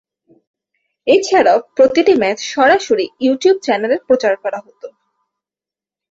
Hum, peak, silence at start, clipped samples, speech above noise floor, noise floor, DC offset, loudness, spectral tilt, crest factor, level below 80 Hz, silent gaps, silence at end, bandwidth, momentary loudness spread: none; -2 dBFS; 1.05 s; under 0.1%; 76 dB; -89 dBFS; under 0.1%; -14 LUFS; -3.5 dB/octave; 14 dB; -58 dBFS; none; 1.25 s; 7.8 kHz; 7 LU